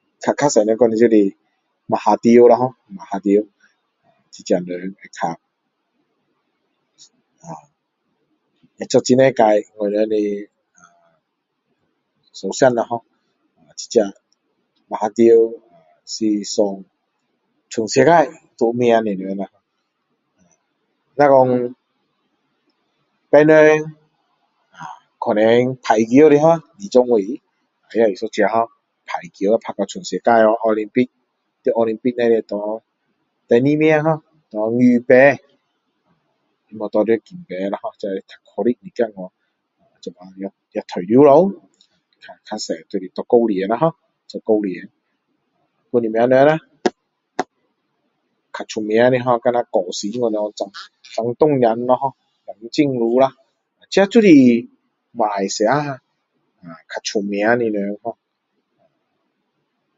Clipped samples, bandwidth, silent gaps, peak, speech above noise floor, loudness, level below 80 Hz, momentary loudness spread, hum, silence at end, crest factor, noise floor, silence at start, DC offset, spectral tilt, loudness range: under 0.1%; 7.8 kHz; none; 0 dBFS; 57 dB; -17 LUFS; -66 dBFS; 20 LU; none; 1.85 s; 18 dB; -73 dBFS; 0.2 s; under 0.1%; -5.5 dB/octave; 8 LU